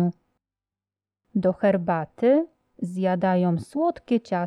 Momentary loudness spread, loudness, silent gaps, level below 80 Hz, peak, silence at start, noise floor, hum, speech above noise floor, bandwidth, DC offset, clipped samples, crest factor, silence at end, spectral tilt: 9 LU; -24 LUFS; none; -64 dBFS; -10 dBFS; 0 s; under -90 dBFS; none; over 67 dB; 11 kHz; under 0.1%; under 0.1%; 16 dB; 0 s; -9 dB/octave